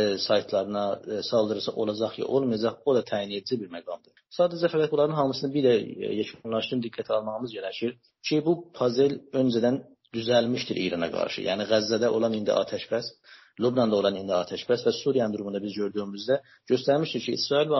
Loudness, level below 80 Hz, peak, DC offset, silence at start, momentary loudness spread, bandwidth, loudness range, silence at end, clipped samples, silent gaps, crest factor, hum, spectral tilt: -27 LUFS; -68 dBFS; -10 dBFS; under 0.1%; 0 s; 8 LU; 6.2 kHz; 2 LU; 0 s; under 0.1%; none; 18 dB; none; -4.5 dB/octave